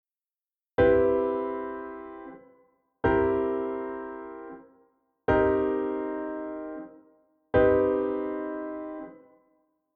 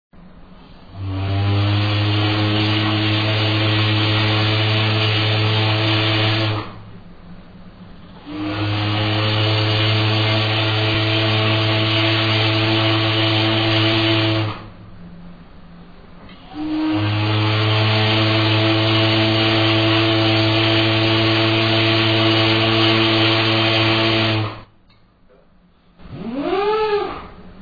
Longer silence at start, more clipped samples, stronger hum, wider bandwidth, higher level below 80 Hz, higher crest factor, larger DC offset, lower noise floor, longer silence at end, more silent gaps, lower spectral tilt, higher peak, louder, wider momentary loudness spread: first, 0.8 s vs 0.25 s; neither; neither; second, 4.3 kHz vs 5 kHz; about the same, -48 dBFS vs -44 dBFS; about the same, 18 dB vs 14 dB; neither; first, under -90 dBFS vs -52 dBFS; first, 0.8 s vs 0 s; neither; first, -10 dB/octave vs -7 dB/octave; second, -10 dBFS vs -4 dBFS; second, -27 LUFS vs -16 LUFS; first, 20 LU vs 8 LU